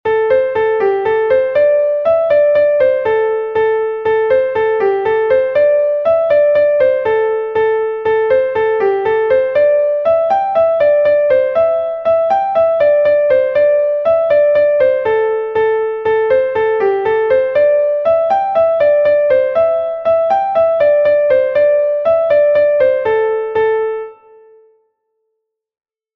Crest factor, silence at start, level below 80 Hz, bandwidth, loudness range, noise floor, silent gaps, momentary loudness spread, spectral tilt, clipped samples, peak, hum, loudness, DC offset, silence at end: 10 dB; 0.05 s; -52 dBFS; 5 kHz; 2 LU; -73 dBFS; none; 4 LU; -6.5 dB/octave; under 0.1%; -2 dBFS; none; -13 LUFS; under 0.1%; 2 s